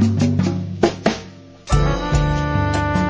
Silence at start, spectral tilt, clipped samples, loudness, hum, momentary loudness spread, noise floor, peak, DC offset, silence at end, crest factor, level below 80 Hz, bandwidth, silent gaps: 0 s; -6.5 dB/octave; under 0.1%; -19 LUFS; none; 7 LU; -38 dBFS; 0 dBFS; under 0.1%; 0 s; 18 dB; -26 dBFS; 8 kHz; none